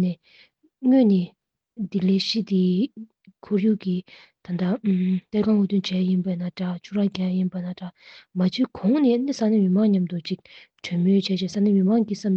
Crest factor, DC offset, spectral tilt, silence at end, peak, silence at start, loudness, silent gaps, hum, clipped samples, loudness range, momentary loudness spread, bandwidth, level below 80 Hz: 14 dB; under 0.1%; -7.5 dB/octave; 0 s; -10 dBFS; 0 s; -23 LUFS; none; none; under 0.1%; 3 LU; 13 LU; 7.2 kHz; -66 dBFS